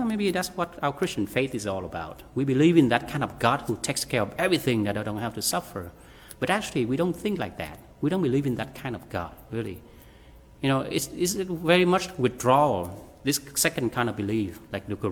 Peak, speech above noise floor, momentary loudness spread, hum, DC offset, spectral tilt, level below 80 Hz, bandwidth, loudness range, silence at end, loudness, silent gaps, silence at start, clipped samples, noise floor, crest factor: -4 dBFS; 24 dB; 13 LU; none; under 0.1%; -4.5 dB/octave; -54 dBFS; 19.5 kHz; 6 LU; 0 s; -26 LUFS; none; 0 s; under 0.1%; -50 dBFS; 22 dB